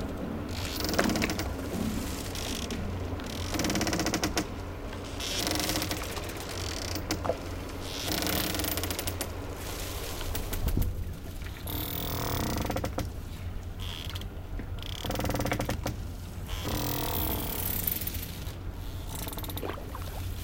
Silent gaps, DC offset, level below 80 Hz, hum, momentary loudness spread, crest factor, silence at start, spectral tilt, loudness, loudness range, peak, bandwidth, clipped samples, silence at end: none; under 0.1%; -40 dBFS; none; 10 LU; 24 dB; 0 s; -4 dB/octave; -33 LUFS; 4 LU; -8 dBFS; 17 kHz; under 0.1%; 0 s